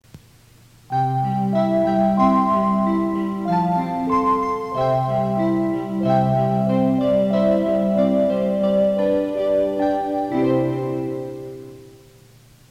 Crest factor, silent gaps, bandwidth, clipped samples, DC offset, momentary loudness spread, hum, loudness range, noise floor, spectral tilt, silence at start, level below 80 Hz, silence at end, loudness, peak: 14 dB; none; 10.5 kHz; under 0.1%; under 0.1%; 6 LU; none; 3 LU; -50 dBFS; -9 dB/octave; 0.15 s; -48 dBFS; 0.8 s; -20 LUFS; -6 dBFS